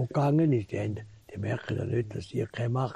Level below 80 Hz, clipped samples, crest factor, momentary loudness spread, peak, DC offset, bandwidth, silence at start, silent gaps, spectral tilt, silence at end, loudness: -60 dBFS; under 0.1%; 14 dB; 12 LU; -16 dBFS; under 0.1%; 10.5 kHz; 0 s; none; -8.5 dB/octave; 0 s; -30 LUFS